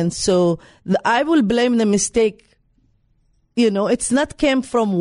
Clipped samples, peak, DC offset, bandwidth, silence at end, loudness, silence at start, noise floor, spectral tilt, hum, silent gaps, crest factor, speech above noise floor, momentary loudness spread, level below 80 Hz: under 0.1%; -6 dBFS; under 0.1%; 11 kHz; 0 s; -18 LUFS; 0 s; -61 dBFS; -4.5 dB/octave; none; none; 12 dB; 43 dB; 5 LU; -48 dBFS